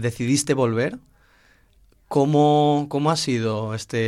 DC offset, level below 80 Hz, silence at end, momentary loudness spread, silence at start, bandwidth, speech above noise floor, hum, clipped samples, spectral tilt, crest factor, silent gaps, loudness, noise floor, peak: under 0.1%; -58 dBFS; 0 s; 10 LU; 0 s; 14.5 kHz; 36 dB; none; under 0.1%; -5.5 dB/octave; 16 dB; none; -21 LUFS; -57 dBFS; -6 dBFS